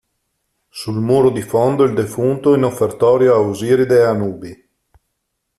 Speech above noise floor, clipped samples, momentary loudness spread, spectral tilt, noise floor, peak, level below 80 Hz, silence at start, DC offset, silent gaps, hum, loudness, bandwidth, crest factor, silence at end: 59 dB; under 0.1%; 12 LU; -7 dB/octave; -73 dBFS; -2 dBFS; -54 dBFS; 0.75 s; under 0.1%; none; none; -15 LUFS; 14 kHz; 14 dB; 1.05 s